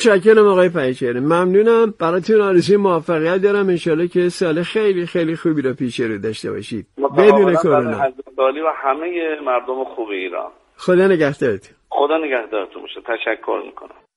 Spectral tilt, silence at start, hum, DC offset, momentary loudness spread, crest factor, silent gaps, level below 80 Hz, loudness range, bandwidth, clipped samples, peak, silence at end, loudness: -6.5 dB/octave; 0 s; none; under 0.1%; 13 LU; 16 dB; none; -60 dBFS; 4 LU; 11.5 kHz; under 0.1%; 0 dBFS; 0.3 s; -17 LUFS